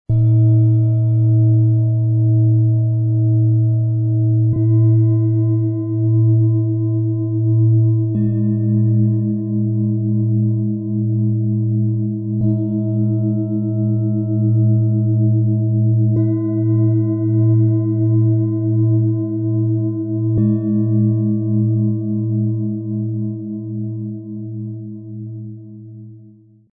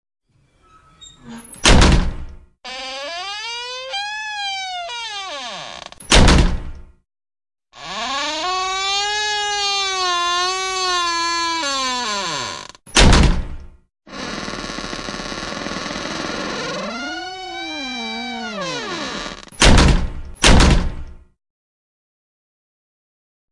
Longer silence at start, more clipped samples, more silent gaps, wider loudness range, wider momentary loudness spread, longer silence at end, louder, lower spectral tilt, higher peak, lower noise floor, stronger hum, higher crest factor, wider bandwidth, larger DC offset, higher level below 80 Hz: second, 0.1 s vs 1 s; neither; neither; second, 5 LU vs 8 LU; second, 10 LU vs 17 LU; second, 0.5 s vs 2.35 s; about the same, -17 LUFS vs -19 LUFS; first, -16.5 dB/octave vs -3.5 dB/octave; second, -6 dBFS vs 0 dBFS; second, -45 dBFS vs -57 dBFS; neither; second, 10 dB vs 20 dB; second, 1.1 kHz vs 11.5 kHz; neither; second, -50 dBFS vs -24 dBFS